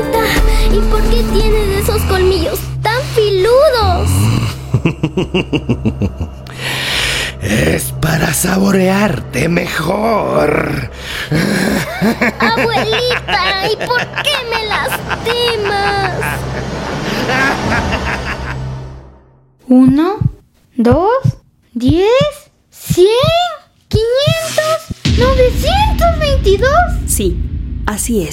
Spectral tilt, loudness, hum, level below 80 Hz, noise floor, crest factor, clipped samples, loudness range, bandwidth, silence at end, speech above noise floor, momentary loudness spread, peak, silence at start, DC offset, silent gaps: -5 dB/octave; -14 LUFS; none; -22 dBFS; -46 dBFS; 14 dB; under 0.1%; 3 LU; 16.5 kHz; 0 s; 33 dB; 9 LU; 0 dBFS; 0 s; under 0.1%; none